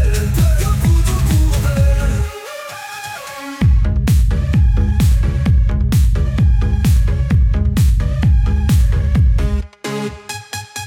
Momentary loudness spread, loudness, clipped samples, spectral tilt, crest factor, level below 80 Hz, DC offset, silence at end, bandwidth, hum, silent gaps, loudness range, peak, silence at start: 12 LU; -16 LUFS; under 0.1%; -6.5 dB/octave; 10 dB; -16 dBFS; under 0.1%; 0 s; 16.5 kHz; none; none; 3 LU; -4 dBFS; 0 s